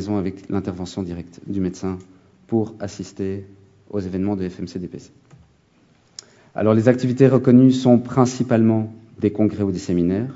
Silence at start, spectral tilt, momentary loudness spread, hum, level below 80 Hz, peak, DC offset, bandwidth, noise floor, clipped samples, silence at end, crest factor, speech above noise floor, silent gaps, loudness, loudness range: 0 s; -8 dB/octave; 19 LU; none; -56 dBFS; -2 dBFS; under 0.1%; 7.8 kHz; -57 dBFS; under 0.1%; 0 s; 20 dB; 38 dB; none; -20 LUFS; 12 LU